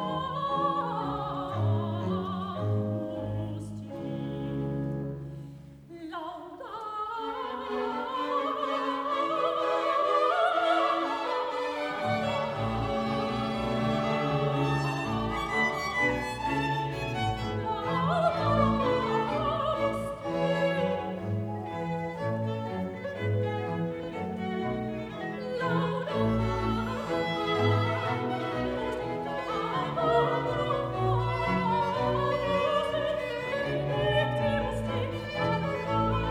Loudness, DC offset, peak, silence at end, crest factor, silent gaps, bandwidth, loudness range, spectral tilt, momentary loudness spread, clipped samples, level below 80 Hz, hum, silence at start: -29 LUFS; under 0.1%; -12 dBFS; 0 s; 18 dB; none; 13 kHz; 6 LU; -7 dB/octave; 9 LU; under 0.1%; -48 dBFS; none; 0 s